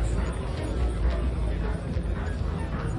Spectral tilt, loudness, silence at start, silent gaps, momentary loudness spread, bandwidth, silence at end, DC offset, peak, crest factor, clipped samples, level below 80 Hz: -7 dB/octave; -30 LUFS; 0 s; none; 3 LU; 11 kHz; 0 s; under 0.1%; -14 dBFS; 12 dB; under 0.1%; -30 dBFS